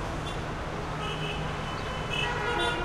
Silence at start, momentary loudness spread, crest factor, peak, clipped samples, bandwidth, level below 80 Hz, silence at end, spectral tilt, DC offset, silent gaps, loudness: 0 s; 6 LU; 16 dB; -16 dBFS; under 0.1%; 14.5 kHz; -42 dBFS; 0 s; -4.5 dB/octave; under 0.1%; none; -31 LUFS